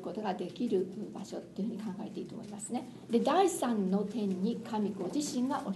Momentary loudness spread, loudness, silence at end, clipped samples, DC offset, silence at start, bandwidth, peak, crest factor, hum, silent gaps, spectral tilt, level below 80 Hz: 13 LU; -34 LUFS; 0 s; under 0.1%; under 0.1%; 0 s; 12 kHz; -16 dBFS; 18 dB; none; none; -5.5 dB/octave; -74 dBFS